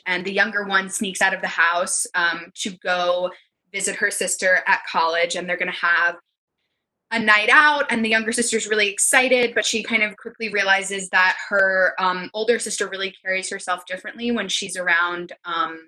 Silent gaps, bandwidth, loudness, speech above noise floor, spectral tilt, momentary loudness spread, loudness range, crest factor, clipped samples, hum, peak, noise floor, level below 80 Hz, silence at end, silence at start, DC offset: 6.38-6.48 s; 12.5 kHz; -20 LUFS; 56 dB; -1.5 dB/octave; 10 LU; 5 LU; 20 dB; under 0.1%; none; -2 dBFS; -77 dBFS; -66 dBFS; 0.05 s; 0.05 s; under 0.1%